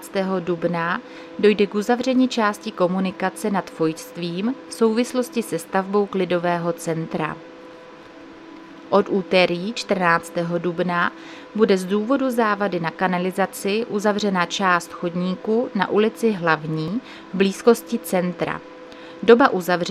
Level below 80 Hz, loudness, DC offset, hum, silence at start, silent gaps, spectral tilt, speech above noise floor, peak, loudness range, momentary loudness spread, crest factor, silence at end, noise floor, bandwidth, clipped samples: -64 dBFS; -21 LUFS; under 0.1%; none; 0 s; none; -5.5 dB/octave; 21 dB; 0 dBFS; 3 LU; 10 LU; 20 dB; 0 s; -42 dBFS; 15 kHz; under 0.1%